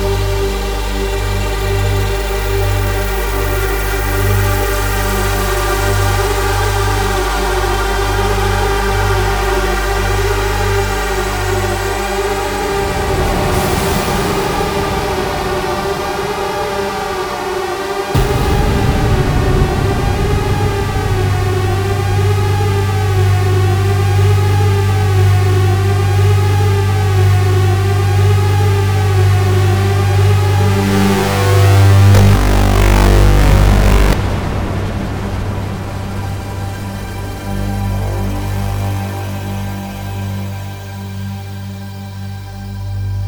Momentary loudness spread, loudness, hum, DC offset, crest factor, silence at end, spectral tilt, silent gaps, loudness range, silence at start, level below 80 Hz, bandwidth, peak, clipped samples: 10 LU; -15 LUFS; 50 Hz at -25 dBFS; under 0.1%; 14 dB; 0 s; -5.5 dB/octave; none; 10 LU; 0 s; -20 dBFS; over 20 kHz; 0 dBFS; under 0.1%